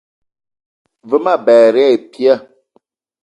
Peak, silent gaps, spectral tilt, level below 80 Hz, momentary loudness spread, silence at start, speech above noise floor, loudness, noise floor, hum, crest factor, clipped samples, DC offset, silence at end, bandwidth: 0 dBFS; none; -5.5 dB/octave; -68 dBFS; 8 LU; 1.05 s; 47 dB; -12 LUFS; -58 dBFS; none; 14 dB; under 0.1%; under 0.1%; 0.85 s; 8.8 kHz